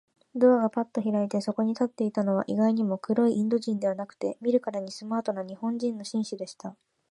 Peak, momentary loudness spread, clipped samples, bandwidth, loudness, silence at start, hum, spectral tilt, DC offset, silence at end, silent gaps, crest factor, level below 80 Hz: -8 dBFS; 10 LU; under 0.1%; 11 kHz; -27 LUFS; 0.35 s; none; -7 dB/octave; under 0.1%; 0.4 s; none; 18 dB; -78 dBFS